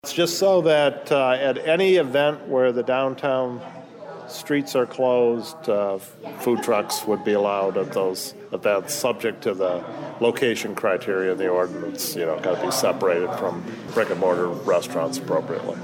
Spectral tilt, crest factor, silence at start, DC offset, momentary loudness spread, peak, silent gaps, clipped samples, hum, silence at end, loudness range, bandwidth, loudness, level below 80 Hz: -4 dB/octave; 14 dB; 0.05 s; under 0.1%; 10 LU; -8 dBFS; none; under 0.1%; none; 0 s; 3 LU; 19 kHz; -22 LUFS; -70 dBFS